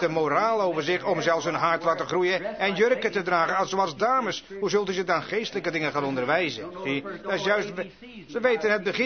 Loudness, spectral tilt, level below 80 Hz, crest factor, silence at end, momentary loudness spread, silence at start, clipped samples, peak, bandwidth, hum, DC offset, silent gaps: -25 LUFS; -4.5 dB/octave; -64 dBFS; 16 dB; 0 s; 7 LU; 0 s; under 0.1%; -8 dBFS; 6.6 kHz; none; 0.1%; none